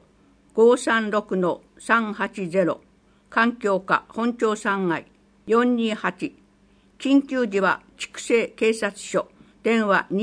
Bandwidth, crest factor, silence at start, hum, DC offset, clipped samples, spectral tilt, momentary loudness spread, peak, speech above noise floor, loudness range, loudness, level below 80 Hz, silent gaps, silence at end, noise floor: 10.5 kHz; 18 dB; 0.55 s; none; under 0.1%; under 0.1%; -5 dB/octave; 10 LU; -4 dBFS; 36 dB; 2 LU; -23 LUFS; -64 dBFS; none; 0 s; -57 dBFS